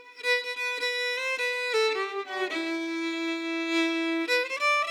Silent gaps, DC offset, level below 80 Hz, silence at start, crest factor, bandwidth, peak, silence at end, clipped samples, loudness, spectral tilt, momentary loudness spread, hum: none; under 0.1%; under -90 dBFS; 0 s; 14 dB; 17 kHz; -14 dBFS; 0 s; under 0.1%; -27 LUFS; 0 dB/octave; 6 LU; none